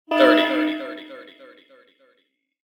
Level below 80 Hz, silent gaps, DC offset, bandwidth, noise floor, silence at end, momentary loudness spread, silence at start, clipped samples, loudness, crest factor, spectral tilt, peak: -78 dBFS; none; under 0.1%; 17.5 kHz; -69 dBFS; 1.45 s; 25 LU; 0.1 s; under 0.1%; -19 LUFS; 20 dB; -4 dB/octave; -2 dBFS